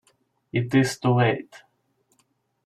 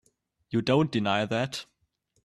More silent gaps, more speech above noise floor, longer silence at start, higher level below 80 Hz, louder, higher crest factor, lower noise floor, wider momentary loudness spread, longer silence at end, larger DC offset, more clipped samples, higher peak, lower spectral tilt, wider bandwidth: neither; about the same, 47 dB vs 47 dB; about the same, 0.55 s vs 0.5 s; about the same, -62 dBFS vs -64 dBFS; first, -23 LUFS vs -27 LUFS; about the same, 18 dB vs 18 dB; second, -69 dBFS vs -73 dBFS; about the same, 9 LU vs 8 LU; first, 1.1 s vs 0.6 s; neither; neither; first, -6 dBFS vs -10 dBFS; about the same, -6.5 dB/octave vs -6 dB/octave; about the same, 13.5 kHz vs 13 kHz